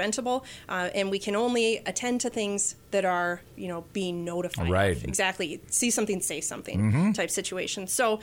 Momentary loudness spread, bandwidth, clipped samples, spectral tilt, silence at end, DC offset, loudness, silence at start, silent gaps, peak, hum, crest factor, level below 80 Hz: 8 LU; 17.5 kHz; under 0.1%; -4 dB/octave; 0 s; under 0.1%; -28 LUFS; 0 s; none; -12 dBFS; none; 16 dB; -52 dBFS